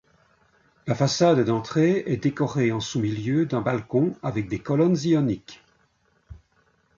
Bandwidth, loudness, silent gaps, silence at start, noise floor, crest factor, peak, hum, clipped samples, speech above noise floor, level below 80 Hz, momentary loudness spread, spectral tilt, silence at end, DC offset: 7.6 kHz; -23 LUFS; none; 0.85 s; -66 dBFS; 18 dB; -8 dBFS; none; under 0.1%; 43 dB; -56 dBFS; 9 LU; -6.5 dB/octave; 0.6 s; under 0.1%